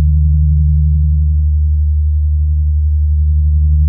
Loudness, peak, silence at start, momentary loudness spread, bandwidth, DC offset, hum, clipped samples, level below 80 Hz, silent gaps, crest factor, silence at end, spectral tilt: -13 LUFS; -4 dBFS; 0 s; 2 LU; 0.2 kHz; under 0.1%; none; under 0.1%; -12 dBFS; none; 6 dB; 0 s; -30 dB/octave